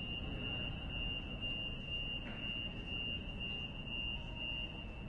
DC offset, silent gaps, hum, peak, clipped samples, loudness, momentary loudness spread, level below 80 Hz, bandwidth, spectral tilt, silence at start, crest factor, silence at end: under 0.1%; none; none; -30 dBFS; under 0.1%; -41 LUFS; 2 LU; -48 dBFS; 8.6 kHz; -6 dB/octave; 0 s; 12 dB; 0 s